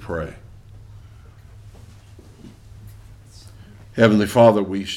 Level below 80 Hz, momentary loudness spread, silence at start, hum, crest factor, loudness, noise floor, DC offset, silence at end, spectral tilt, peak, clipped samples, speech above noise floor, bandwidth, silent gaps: -46 dBFS; 18 LU; 0 s; none; 22 dB; -17 LUFS; -44 dBFS; under 0.1%; 0 s; -6.5 dB/octave; 0 dBFS; under 0.1%; 27 dB; 15.5 kHz; none